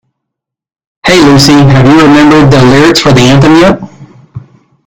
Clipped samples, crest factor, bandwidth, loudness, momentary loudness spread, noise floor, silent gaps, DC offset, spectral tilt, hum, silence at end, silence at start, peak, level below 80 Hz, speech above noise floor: 10%; 4 dB; 17.5 kHz; -3 LUFS; 5 LU; -77 dBFS; none; under 0.1%; -5.5 dB/octave; none; 0.5 s; 1.05 s; 0 dBFS; -30 dBFS; 75 dB